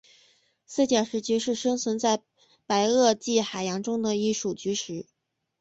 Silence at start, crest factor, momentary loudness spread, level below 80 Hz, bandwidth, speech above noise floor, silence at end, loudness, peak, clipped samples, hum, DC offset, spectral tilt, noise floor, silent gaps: 0.7 s; 18 dB; 8 LU; -68 dBFS; 8.2 kHz; 38 dB; 0.6 s; -26 LUFS; -8 dBFS; under 0.1%; none; under 0.1%; -3.5 dB/octave; -63 dBFS; none